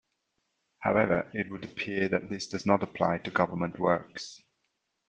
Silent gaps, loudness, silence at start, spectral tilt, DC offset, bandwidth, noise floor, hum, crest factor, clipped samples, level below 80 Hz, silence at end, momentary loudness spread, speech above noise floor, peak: none; -29 LUFS; 0.8 s; -6 dB/octave; under 0.1%; 9.2 kHz; -79 dBFS; none; 24 dB; under 0.1%; -64 dBFS; 0.7 s; 9 LU; 50 dB; -8 dBFS